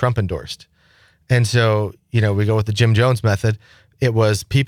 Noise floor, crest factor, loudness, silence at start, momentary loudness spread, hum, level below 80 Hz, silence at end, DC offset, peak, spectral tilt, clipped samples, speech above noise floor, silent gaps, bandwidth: -55 dBFS; 12 dB; -18 LUFS; 0 s; 10 LU; none; -46 dBFS; 0 s; under 0.1%; -6 dBFS; -6 dB/octave; under 0.1%; 38 dB; none; 15 kHz